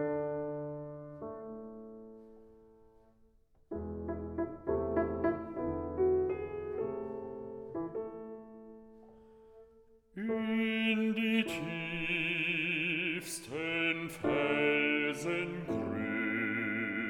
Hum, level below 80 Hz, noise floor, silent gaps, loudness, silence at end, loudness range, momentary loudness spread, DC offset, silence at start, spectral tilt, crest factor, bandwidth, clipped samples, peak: none; -60 dBFS; -65 dBFS; none; -34 LUFS; 0 s; 13 LU; 16 LU; under 0.1%; 0 s; -5 dB/octave; 18 dB; 18.5 kHz; under 0.1%; -18 dBFS